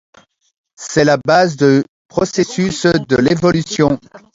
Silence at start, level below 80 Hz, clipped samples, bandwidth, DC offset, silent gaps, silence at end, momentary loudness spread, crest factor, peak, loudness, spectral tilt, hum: 0.8 s; -46 dBFS; under 0.1%; 7.8 kHz; under 0.1%; 1.89-2.09 s; 0.15 s; 8 LU; 14 dB; 0 dBFS; -14 LUFS; -5.5 dB/octave; none